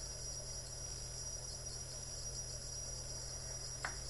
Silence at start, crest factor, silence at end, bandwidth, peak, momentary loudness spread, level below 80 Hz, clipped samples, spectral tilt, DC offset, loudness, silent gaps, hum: 0 s; 20 dB; 0 s; 12 kHz; -26 dBFS; 2 LU; -54 dBFS; under 0.1%; -1.5 dB/octave; under 0.1%; -44 LUFS; none; none